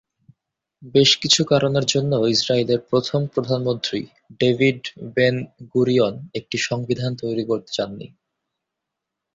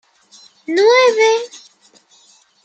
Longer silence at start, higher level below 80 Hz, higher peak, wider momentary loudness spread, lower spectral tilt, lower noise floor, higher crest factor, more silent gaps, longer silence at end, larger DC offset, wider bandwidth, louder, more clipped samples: about the same, 0.8 s vs 0.7 s; first, -58 dBFS vs -78 dBFS; about the same, -2 dBFS vs -2 dBFS; second, 11 LU vs 21 LU; first, -4.5 dB/octave vs -0.5 dB/octave; first, -83 dBFS vs -52 dBFS; about the same, 18 dB vs 16 dB; neither; first, 1.3 s vs 1.1 s; neither; about the same, 8 kHz vs 8.8 kHz; second, -20 LUFS vs -13 LUFS; neither